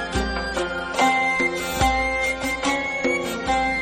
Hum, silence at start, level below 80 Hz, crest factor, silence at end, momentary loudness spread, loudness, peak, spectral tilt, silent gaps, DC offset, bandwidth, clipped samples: none; 0 s; -36 dBFS; 16 dB; 0 s; 6 LU; -22 LUFS; -6 dBFS; -3.5 dB/octave; none; under 0.1%; 16.5 kHz; under 0.1%